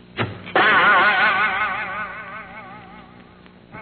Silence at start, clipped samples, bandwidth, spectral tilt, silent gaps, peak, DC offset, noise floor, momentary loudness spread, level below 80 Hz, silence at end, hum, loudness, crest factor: 0.15 s; under 0.1%; 4.6 kHz; -7 dB/octave; none; -6 dBFS; under 0.1%; -46 dBFS; 22 LU; -56 dBFS; 0 s; 60 Hz at -50 dBFS; -17 LUFS; 16 dB